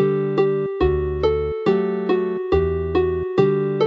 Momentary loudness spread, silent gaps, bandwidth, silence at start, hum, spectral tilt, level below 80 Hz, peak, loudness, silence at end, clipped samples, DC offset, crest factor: 2 LU; none; 5.8 kHz; 0 s; none; -9 dB/octave; -34 dBFS; -2 dBFS; -20 LUFS; 0 s; under 0.1%; under 0.1%; 18 dB